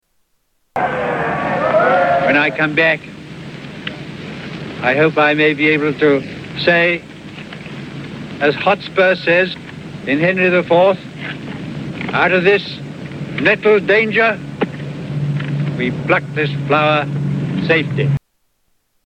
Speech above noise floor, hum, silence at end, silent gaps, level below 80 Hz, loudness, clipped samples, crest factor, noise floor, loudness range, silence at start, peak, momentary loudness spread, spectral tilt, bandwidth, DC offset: 50 dB; none; 0.85 s; none; -50 dBFS; -15 LUFS; under 0.1%; 16 dB; -64 dBFS; 2 LU; 0.75 s; 0 dBFS; 17 LU; -7 dB/octave; 9.4 kHz; under 0.1%